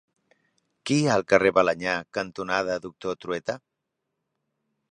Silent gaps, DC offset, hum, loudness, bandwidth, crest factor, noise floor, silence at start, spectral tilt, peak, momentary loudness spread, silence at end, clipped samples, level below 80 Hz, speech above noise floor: none; under 0.1%; none; -25 LUFS; 11 kHz; 24 dB; -82 dBFS; 0.85 s; -5 dB/octave; -4 dBFS; 13 LU; 1.35 s; under 0.1%; -62 dBFS; 57 dB